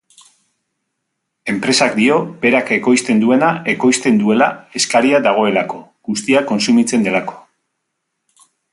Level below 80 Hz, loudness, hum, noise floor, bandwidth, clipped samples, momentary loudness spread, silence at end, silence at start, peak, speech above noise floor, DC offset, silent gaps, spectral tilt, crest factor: -62 dBFS; -14 LUFS; none; -74 dBFS; 11.5 kHz; under 0.1%; 9 LU; 1.35 s; 1.45 s; 0 dBFS; 60 dB; under 0.1%; none; -4 dB/octave; 16 dB